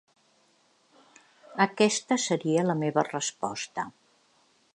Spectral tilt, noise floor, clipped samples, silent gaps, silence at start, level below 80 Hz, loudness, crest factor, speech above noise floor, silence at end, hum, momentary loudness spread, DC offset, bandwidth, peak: -4 dB/octave; -66 dBFS; under 0.1%; none; 1.5 s; -78 dBFS; -27 LUFS; 22 dB; 39 dB; 0.85 s; none; 12 LU; under 0.1%; 11 kHz; -8 dBFS